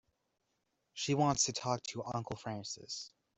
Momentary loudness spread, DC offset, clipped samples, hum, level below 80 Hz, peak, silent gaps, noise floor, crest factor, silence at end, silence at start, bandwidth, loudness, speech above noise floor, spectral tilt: 13 LU; under 0.1%; under 0.1%; none; -68 dBFS; -16 dBFS; none; -83 dBFS; 22 dB; 0.3 s; 0.95 s; 8.2 kHz; -36 LUFS; 46 dB; -3.5 dB/octave